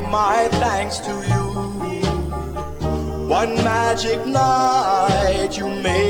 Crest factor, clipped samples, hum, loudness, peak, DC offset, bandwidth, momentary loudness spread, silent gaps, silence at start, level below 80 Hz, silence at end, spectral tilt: 14 dB; under 0.1%; none; -20 LUFS; -6 dBFS; under 0.1%; 18.5 kHz; 9 LU; none; 0 s; -32 dBFS; 0 s; -5 dB/octave